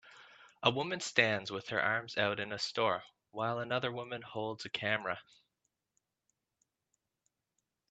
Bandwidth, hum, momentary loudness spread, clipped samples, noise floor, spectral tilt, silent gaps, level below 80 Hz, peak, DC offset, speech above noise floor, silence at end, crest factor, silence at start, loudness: 8.8 kHz; none; 10 LU; under 0.1%; -85 dBFS; -4 dB/octave; none; -78 dBFS; -10 dBFS; under 0.1%; 50 dB; 2.7 s; 28 dB; 0.05 s; -35 LUFS